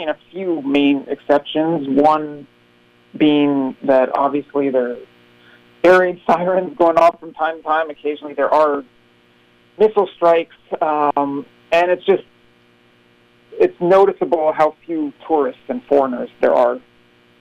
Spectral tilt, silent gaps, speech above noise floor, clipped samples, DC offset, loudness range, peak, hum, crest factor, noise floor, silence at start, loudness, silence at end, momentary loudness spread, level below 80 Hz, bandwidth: -6.5 dB/octave; none; 37 dB; under 0.1%; under 0.1%; 2 LU; -2 dBFS; 60 Hz at -55 dBFS; 14 dB; -53 dBFS; 0 s; -17 LUFS; 0.6 s; 11 LU; -58 dBFS; 8.6 kHz